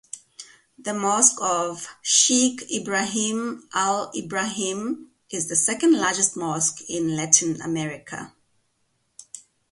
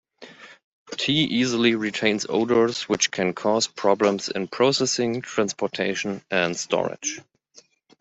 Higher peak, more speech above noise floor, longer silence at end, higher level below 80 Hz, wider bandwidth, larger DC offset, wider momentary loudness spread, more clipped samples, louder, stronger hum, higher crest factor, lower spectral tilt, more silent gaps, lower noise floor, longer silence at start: first, 0 dBFS vs -4 dBFS; first, 47 dB vs 33 dB; second, 0.3 s vs 0.8 s; about the same, -68 dBFS vs -64 dBFS; first, 11.5 kHz vs 8.2 kHz; neither; first, 18 LU vs 7 LU; neither; about the same, -22 LUFS vs -23 LUFS; neither; about the same, 24 dB vs 20 dB; second, -2 dB/octave vs -3.5 dB/octave; second, none vs 0.64-0.86 s; first, -70 dBFS vs -55 dBFS; about the same, 0.15 s vs 0.2 s